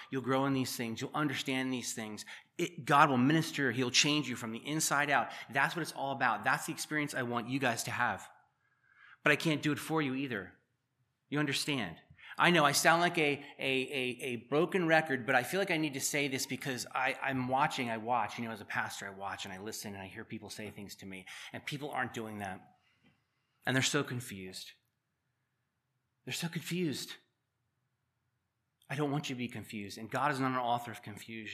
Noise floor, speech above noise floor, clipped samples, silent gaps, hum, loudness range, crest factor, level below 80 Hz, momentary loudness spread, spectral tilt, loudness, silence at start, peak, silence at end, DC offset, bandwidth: -83 dBFS; 49 dB; under 0.1%; none; none; 12 LU; 26 dB; -80 dBFS; 17 LU; -3.5 dB/octave; -33 LUFS; 0 s; -10 dBFS; 0 s; under 0.1%; 15 kHz